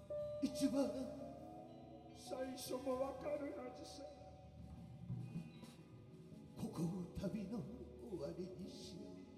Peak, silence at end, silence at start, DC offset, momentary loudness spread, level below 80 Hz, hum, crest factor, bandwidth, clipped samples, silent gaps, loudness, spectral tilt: -26 dBFS; 0 s; 0 s; under 0.1%; 17 LU; -68 dBFS; none; 20 dB; 15 kHz; under 0.1%; none; -47 LUFS; -6.5 dB/octave